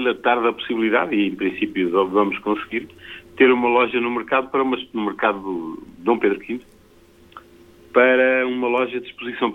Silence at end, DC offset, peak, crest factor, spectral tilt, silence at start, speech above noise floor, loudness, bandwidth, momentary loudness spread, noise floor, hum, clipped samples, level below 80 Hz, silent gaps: 0 s; under 0.1%; -2 dBFS; 20 dB; -6.5 dB/octave; 0 s; 31 dB; -20 LUFS; 4.3 kHz; 13 LU; -51 dBFS; none; under 0.1%; -58 dBFS; none